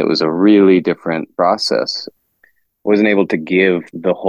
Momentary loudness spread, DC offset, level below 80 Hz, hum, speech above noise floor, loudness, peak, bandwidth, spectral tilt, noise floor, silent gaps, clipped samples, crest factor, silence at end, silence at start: 11 LU; under 0.1%; -60 dBFS; none; 43 dB; -14 LUFS; 0 dBFS; 10 kHz; -6 dB/octave; -57 dBFS; none; under 0.1%; 14 dB; 0 s; 0 s